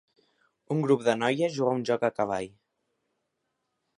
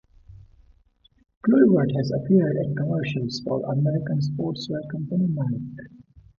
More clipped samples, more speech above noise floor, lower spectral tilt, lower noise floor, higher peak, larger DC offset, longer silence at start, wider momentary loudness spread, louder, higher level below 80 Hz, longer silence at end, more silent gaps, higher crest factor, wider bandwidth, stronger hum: neither; first, 54 dB vs 38 dB; second, -6 dB/octave vs -8.5 dB/octave; first, -80 dBFS vs -61 dBFS; second, -10 dBFS vs -4 dBFS; neither; first, 0.7 s vs 0.3 s; second, 8 LU vs 12 LU; second, -27 LUFS vs -23 LUFS; second, -70 dBFS vs -56 dBFS; first, 1.5 s vs 0.5 s; second, none vs 1.37-1.41 s; about the same, 20 dB vs 20 dB; first, 11 kHz vs 7.2 kHz; neither